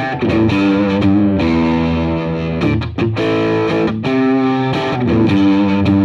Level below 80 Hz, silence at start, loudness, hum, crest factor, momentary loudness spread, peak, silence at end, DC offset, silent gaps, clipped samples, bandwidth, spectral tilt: -34 dBFS; 0 s; -15 LUFS; none; 12 dB; 5 LU; -2 dBFS; 0 s; under 0.1%; none; under 0.1%; 7.6 kHz; -8 dB/octave